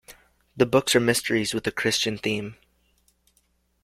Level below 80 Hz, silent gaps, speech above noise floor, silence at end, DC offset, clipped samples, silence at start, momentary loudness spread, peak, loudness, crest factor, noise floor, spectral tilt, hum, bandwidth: -58 dBFS; none; 44 dB; 1.3 s; under 0.1%; under 0.1%; 0.1 s; 8 LU; -4 dBFS; -23 LUFS; 22 dB; -68 dBFS; -3.5 dB/octave; none; 16.5 kHz